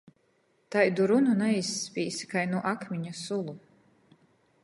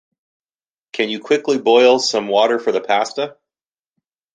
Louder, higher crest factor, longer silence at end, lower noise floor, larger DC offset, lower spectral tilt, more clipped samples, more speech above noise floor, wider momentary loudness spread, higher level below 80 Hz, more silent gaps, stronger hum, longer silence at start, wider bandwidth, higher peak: second, -28 LUFS vs -16 LUFS; about the same, 20 dB vs 16 dB; about the same, 1.05 s vs 1.05 s; second, -69 dBFS vs under -90 dBFS; neither; first, -5 dB/octave vs -3 dB/octave; neither; second, 42 dB vs over 74 dB; about the same, 12 LU vs 12 LU; second, -76 dBFS vs -70 dBFS; neither; neither; second, 0.7 s vs 0.95 s; first, 11.5 kHz vs 9.4 kHz; second, -10 dBFS vs -2 dBFS